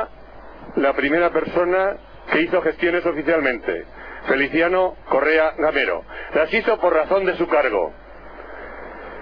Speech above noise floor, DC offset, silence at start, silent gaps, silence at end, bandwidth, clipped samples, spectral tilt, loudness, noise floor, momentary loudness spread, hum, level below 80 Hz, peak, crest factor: 20 dB; under 0.1%; 0 s; none; 0 s; 5.4 kHz; under 0.1%; -7.5 dB/octave; -20 LUFS; -40 dBFS; 18 LU; none; -46 dBFS; -4 dBFS; 18 dB